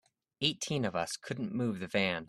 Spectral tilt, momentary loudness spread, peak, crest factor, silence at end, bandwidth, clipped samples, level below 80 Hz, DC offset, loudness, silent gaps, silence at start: -4 dB/octave; 6 LU; -14 dBFS; 22 dB; 0.05 s; 13 kHz; under 0.1%; -68 dBFS; under 0.1%; -34 LUFS; none; 0.4 s